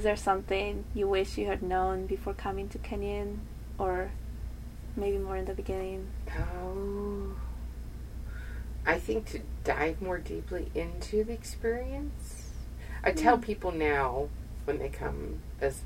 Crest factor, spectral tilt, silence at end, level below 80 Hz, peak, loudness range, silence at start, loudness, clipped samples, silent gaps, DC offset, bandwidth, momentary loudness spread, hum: 22 dB; -6 dB/octave; 0 s; -40 dBFS; -10 dBFS; 5 LU; 0 s; -33 LUFS; under 0.1%; none; under 0.1%; 16 kHz; 13 LU; none